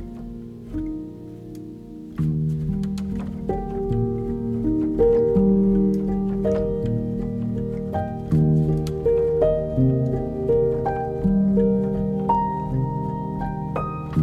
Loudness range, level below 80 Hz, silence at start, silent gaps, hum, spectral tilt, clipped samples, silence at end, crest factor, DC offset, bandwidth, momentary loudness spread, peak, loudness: 6 LU; -36 dBFS; 0 s; none; none; -10.5 dB/octave; under 0.1%; 0 s; 14 dB; under 0.1%; 8 kHz; 15 LU; -8 dBFS; -23 LUFS